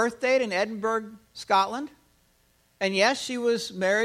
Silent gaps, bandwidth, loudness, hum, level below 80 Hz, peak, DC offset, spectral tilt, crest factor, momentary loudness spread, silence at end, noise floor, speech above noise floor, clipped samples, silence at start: none; 15 kHz; -26 LUFS; none; -68 dBFS; -8 dBFS; under 0.1%; -3.5 dB/octave; 20 dB; 13 LU; 0 s; -65 dBFS; 39 dB; under 0.1%; 0 s